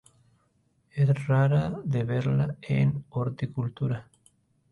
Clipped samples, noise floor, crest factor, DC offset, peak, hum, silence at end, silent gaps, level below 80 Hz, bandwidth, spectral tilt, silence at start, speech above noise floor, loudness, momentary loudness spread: under 0.1%; -69 dBFS; 14 dB; under 0.1%; -14 dBFS; none; 0.7 s; none; -56 dBFS; 10.5 kHz; -9 dB/octave; 0.95 s; 43 dB; -27 LUFS; 9 LU